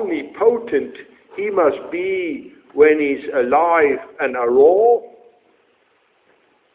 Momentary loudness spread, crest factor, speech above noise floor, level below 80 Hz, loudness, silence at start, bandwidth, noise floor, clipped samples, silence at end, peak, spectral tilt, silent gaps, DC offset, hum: 13 LU; 16 dB; 44 dB; -60 dBFS; -17 LUFS; 0 s; 4 kHz; -60 dBFS; under 0.1%; 1.65 s; -2 dBFS; -9 dB/octave; none; under 0.1%; none